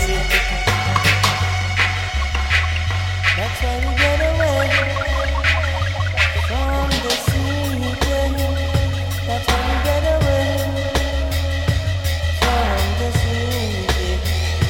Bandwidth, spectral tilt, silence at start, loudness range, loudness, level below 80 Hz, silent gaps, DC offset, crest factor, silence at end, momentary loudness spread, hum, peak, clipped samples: 17 kHz; -4.5 dB/octave; 0 s; 2 LU; -19 LUFS; -24 dBFS; none; under 0.1%; 16 dB; 0 s; 5 LU; none; -2 dBFS; under 0.1%